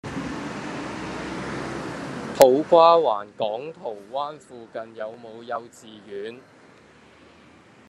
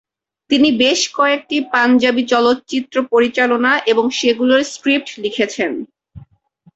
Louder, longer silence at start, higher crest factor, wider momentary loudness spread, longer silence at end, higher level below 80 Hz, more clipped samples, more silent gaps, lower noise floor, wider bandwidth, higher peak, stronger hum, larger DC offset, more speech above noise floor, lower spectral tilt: second, -23 LUFS vs -15 LUFS; second, 0.05 s vs 0.5 s; first, 24 dB vs 14 dB; first, 22 LU vs 7 LU; first, 1.5 s vs 0.55 s; about the same, -56 dBFS vs -56 dBFS; neither; neither; about the same, -51 dBFS vs -53 dBFS; first, 12.5 kHz vs 8 kHz; about the same, 0 dBFS vs -2 dBFS; neither; neither; second, 29 dB vs 38 dB; first, -5 dB/octave vs -2.5 dB/octave